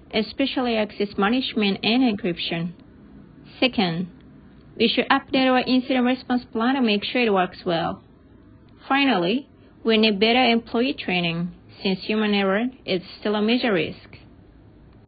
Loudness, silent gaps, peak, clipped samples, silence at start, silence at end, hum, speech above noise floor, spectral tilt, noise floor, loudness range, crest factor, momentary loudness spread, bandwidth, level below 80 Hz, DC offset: -22 LUFS; none; -2 dBFS; under 0.1%; 0.1 s; 0.9 s; none; 28 dB; -10 dB/octave; -50 dBFS; 3 LU; 20 dB; 9 LU; 5 kHz; -54 dBFS; under 0.1%